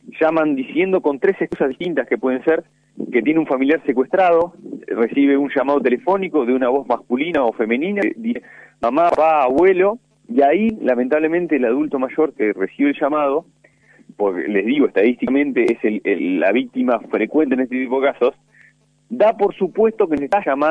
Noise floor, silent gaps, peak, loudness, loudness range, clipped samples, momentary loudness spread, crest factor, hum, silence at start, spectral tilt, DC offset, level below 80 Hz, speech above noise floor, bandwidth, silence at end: -53 dBFS; none; -2 dBFS; -18 LUFS; 3 LU; under 0.1%; 6 LU; 14 dB; none; 0.05 s; -7.5 dB/octave; under 0.1%; -58 dBFS; 36 dB; 7.8 kHz; 0 s